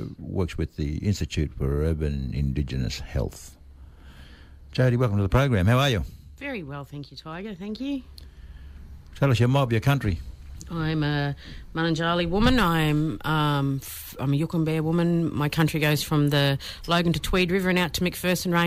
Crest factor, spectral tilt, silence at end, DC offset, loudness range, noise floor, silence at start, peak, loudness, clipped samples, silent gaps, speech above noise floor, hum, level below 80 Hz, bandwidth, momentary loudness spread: 14 dB; -6 dB/octave; 0 s; under 0.1%; 6 LU; -46 dBFS; 0 s; -10 dBFS; -25 LUFS; under 0.1%; none; 22 dB; none; -38 dBFS; 16 kHz; 14 LU